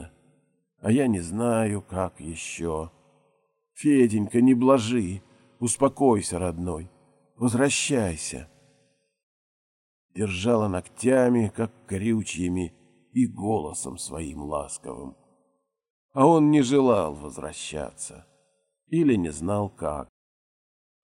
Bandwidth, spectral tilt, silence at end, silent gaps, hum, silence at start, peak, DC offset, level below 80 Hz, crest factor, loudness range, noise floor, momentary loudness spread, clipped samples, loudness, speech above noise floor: 15.5 kHz; -5.5 dB/octave; 1 s; 9.23-10.09 s, 15.90-16.09 s; none; 0 s; -6 dBFS; under 0.1%; -54 dBFS; 20 dB; 6 LU; -72 dBFS; 16 LU; under 0.1%; -25 LUFS; 48 dB